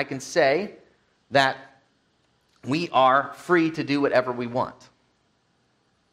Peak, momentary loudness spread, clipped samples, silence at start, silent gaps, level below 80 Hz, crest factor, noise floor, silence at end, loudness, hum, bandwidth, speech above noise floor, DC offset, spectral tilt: -4 dBFS; 11 LU; under 0.1%; 0 s; none; -68 dBFS; 20 dB; -67 dBFS; 1.4 s; -23 LUFS; none; 13.5 kHz; 45 dB; under 0.1%; -5 dB/octave